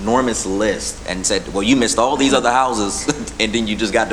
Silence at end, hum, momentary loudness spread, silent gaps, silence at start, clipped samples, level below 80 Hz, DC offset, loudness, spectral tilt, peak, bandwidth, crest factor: 0 s; none; 6 LU; none; 0 s; under 0.1%; -36 dBFS; under 0.1%; -17 LUFS; -3 dB/octave; -2 dBFS; 13.5 kHz; 16 dB